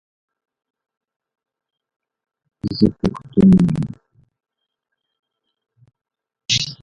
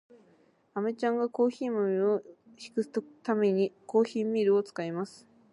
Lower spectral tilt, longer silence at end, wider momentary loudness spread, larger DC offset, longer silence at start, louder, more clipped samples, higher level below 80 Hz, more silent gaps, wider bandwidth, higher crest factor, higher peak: about the same, -6 dB/octave vs -7 dB/octave; second, 0.1 s vs 0.45 s; first, 16 LU vs 9 LU; neither; first, 2.65 s vs 0.75 s; first, -17 LUFS vs -30 LUFS; neither; first, -44 dBFS vs -84 dBFS; first, 5.19-5.23 s vs none; second, 7.6 kHz vs 11 kHz; about the same, 22 dB vs 18 dB; first, -2 dBFS vs -12 dBFS